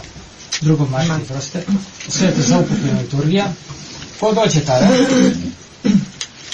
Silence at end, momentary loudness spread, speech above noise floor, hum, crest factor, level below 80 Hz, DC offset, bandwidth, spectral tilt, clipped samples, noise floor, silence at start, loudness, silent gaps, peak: 0 s; 16 LU; 21 dB; none; 16 dB; -44 dBFS; under 0.1%; 9.8 kHz; -5.5 dB/octave; under 0.1%; -36 dBFS; 0 s; -16 LUFS; none; -2 dBFS